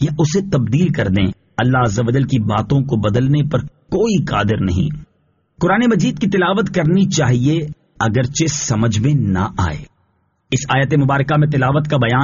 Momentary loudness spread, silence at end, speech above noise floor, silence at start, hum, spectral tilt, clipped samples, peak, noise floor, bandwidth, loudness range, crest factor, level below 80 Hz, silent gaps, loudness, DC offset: 7 LU; 0 s; 47 dB; 0 s; none; -6.5 dB/octave; under 0.1%; -4 dBFS; -62 dBFS; 7.4 kHz; 2 LU; 12 dB; -40 dBFS; none; -16 LUFS; under 0.1%